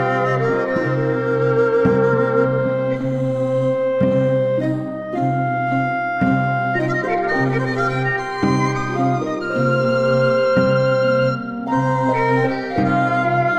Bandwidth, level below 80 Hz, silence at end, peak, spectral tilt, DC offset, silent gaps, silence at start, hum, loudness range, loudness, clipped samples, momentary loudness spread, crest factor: 8.6 kHz; -50 dBFS; 0 s; -4 dBFS; -7.5 dB/octave; 0.2%; none; 0 s; none; 2 LU; -18 LUFS; under 0.1%; 5 LU; 14 dB